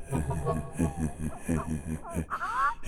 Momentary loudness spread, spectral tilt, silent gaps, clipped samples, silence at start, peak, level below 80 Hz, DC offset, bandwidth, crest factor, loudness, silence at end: 6 LU; -6.5 dB/octave; none; under 0.1%; 0 s; -14 dBFS; -42 dBFS; under 0.1%; 16 kHz; 18 dB; -32 LUFS; 0 s